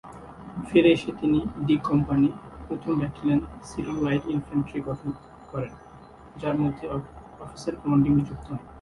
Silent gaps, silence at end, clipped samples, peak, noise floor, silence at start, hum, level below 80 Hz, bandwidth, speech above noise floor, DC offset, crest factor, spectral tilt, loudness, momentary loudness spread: none; 0 s; under 0.1%; -6 dBFS; -47 dBFS; 0.05 s; none; -48 dBFS; 11.5 kHz; 23 dB; under 0.1%; 20 dB; -7.5 dB/octave; -26 LUFS; 18 LU